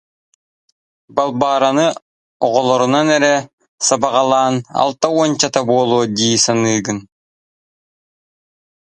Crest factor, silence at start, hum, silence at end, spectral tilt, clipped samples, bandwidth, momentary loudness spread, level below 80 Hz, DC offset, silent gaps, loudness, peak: 16 dB; 1.15 s; none; 1.9 s; -3.5 dB/octave; under 0.1%; 11.5 kHz; 6 LU; -58 dBFS; under 0.1%; 2.02-2.40 s, 3.53-3.58 s, 3.68-3.78 s; -15 LUFS; 0 dBFS